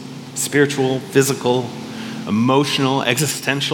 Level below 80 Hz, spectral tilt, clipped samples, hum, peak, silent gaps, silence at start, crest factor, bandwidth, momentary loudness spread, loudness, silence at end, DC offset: -66 dBFS; -4 dB/octave; under 0.1%; none; 0 dBFS; none; 0 s; 18 dB; 18 kHz; 13 LU; -18 LUFS; 0 s; under 0.1%